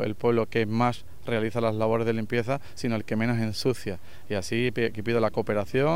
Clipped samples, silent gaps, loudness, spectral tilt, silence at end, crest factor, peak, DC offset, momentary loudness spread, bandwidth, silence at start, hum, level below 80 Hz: under 0.1%; none; -27 LUFS; -6.5 dB/octave; 0 s; 16 dB; -10 dBFS; 2%; 7 LU; 16 kHz; 0 s; none; -56 dBFS